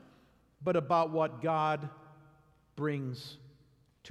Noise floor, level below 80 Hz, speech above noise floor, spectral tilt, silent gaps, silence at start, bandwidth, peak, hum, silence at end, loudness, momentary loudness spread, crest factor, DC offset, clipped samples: -66 dBFS; -72 dBFS; 34 dB; -7.5 dB/octave; none; 0.6 s; 13 kHz; -16 dBFS; none; 0 s; -32 LUFS; 19 LU; 20 dB; under 0.1%; under 0.1%